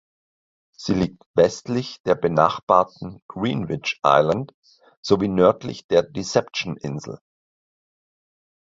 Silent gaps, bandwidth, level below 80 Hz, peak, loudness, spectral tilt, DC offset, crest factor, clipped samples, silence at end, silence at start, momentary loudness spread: 1.26-1.34 s, 2.00-2.04 s, 2.63-2.67 s, 3.22-3.29 s, 4.54-4.63 s, 4.97-5.03 s, 5.84-5.89 s; 7.8 kHz; -52 dBFS; 0 dBFS; -21 LUFS; -6 dB/octave; under 0.1%; 22 dB; under 0.1%; 1.5 s; 0.8 s; 16 LU